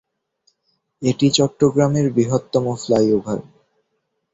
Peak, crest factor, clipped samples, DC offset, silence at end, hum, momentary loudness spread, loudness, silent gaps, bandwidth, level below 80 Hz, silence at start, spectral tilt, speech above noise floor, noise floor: -2 dBFS; 18 dB; under 0.1%; under 0.1%; 0.9 s; none; 7 LU; -18 LUFS; none; 8.2 kHz; -54 dBFS; 1 s; -6 dB/octave; 55 dB; -72 dBFS